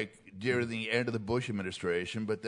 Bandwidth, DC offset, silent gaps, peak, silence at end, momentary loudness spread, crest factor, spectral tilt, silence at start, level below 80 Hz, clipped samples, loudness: 11 kHz; under 0.1%; none; -14 dBFS; 0 s; 5 LU; 18 dB; -5.5 dB/octave; 0 s; -66 dBFS; under 0.1%; -33 LUFS